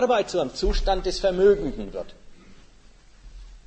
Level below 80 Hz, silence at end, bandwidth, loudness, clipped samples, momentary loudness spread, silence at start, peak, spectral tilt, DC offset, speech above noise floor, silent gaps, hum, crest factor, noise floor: -34 dBFS; 0.1 s; 8.8 kHz; -24 LUFS; under 0.1%; 15 LU; 0 s; -8 dBFS; -5 dB/octave; under 0.1%; 28 dB; none; none; 16 dB; -50 dBFS